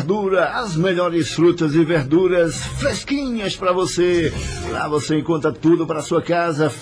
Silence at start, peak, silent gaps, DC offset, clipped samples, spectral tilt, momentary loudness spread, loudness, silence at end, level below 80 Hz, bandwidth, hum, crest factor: 0 s; -6 dBFS; none; under 0.1%; under 0.1%; -5.5 dB/octave; 6 LU; -19 LUFS; 0 s; -40 dBFS; 10.5 kHz; none; 12 dB